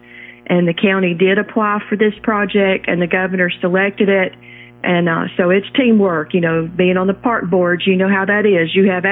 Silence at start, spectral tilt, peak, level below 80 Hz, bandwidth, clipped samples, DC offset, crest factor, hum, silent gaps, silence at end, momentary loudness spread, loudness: 0.15 s; -10 dB/octave; 0 dBFS; -54 dBFS; 4 kHz; under 0.1%; under 0.1%; 14 dB; none; none; 0 s; 4 LU; -15 LUFS